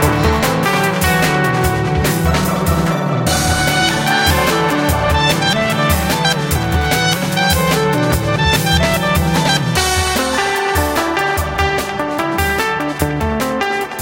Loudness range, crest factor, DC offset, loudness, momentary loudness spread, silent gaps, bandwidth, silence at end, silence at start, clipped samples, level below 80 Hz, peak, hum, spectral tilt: 2 LU; 14 dB; under 0.1%; -15 LUFS; 4 LU; none; 17 kHz; 0 s; 0 s; under 0.1%; -26 dBFS; 0 dBFS; none; -4 dB/octave